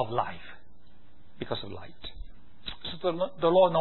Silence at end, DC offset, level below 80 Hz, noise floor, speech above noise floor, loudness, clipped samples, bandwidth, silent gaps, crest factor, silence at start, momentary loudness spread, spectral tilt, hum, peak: 0 s; 1%; -52 dBFS; -59 dBFS; 31 dB; -29 LUFS; under 0.1%; 4.3 kHz; none; 20 dB; 0 s; 21 LU; -9.5 dB/octave; none; -10 dBFS